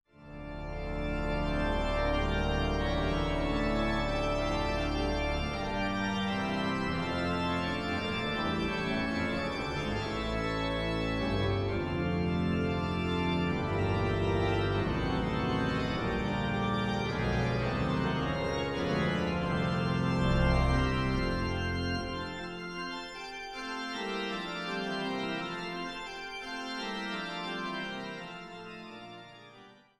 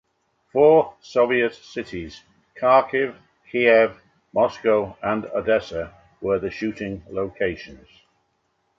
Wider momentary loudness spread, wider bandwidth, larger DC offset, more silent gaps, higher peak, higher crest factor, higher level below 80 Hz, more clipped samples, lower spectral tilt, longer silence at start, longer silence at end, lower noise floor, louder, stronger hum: second, 9 LU vs 16 LU; first, 12 kHz vs 7.4 kHz; neither; neither; second, -16 dBFS vs -4 dBFS; about the same, 16 dB vs 18 dB; first, -40 dBFS vs -54 dBFS; neither; about the same, -6.5 dB/octave vs -6.5 dB/octave; second, 0.2 s vs 0.55 s; second, 0.25 s vs 1.05 s; second, -56 dBFS vs -70 dBFS; second, -32 LUFS vs -21 LUFS; neither